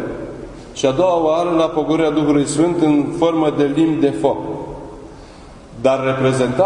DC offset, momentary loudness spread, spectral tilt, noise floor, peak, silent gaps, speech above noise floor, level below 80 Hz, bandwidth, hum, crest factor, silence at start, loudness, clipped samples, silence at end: under 0.1%; 16 LU; -6 dB/octave; -38 dBFS; 0 dBFS; none; 23 dB; -44 dBFS; 11 kHz; none; 16 dB; 0 s; -17 LUFS; under 0.1%; 0 s